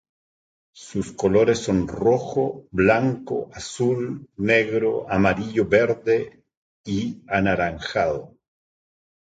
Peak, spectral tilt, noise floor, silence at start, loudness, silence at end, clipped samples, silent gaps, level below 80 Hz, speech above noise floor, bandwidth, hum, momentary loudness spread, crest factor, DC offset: -4 dBFS; -6 dB/octave; under -90 dBFS; 0.75 s; -22 LUFS; 1.05 s; under 0.1%; 6.57-6.84 s; -48 dBFS; over 68 dB; 9.2 kHz; none; 11 LU; 18 dB; under 0.1%